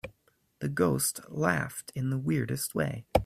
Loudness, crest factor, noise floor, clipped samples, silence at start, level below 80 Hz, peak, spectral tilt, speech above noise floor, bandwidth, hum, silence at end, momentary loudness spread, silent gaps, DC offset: -30 LUFS; 24 dB; -68 dBFS; under 0.1%; 0.05 s; -50 dBFS; -6 dBFS; -5 dB/octave; 38 dB; 16 kHz; none; 0 s; 9 LU; none; under 0.1%